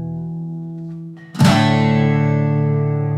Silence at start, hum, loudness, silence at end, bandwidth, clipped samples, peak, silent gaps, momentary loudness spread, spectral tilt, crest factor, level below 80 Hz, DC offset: 0 s; none; -16 LUFS; 0 s; 13.5 kHz; under 0.1%; 0 dBFS; none; 17 LU; -7 dB/octave; 16 dB; -48 dBFS; under 0.1%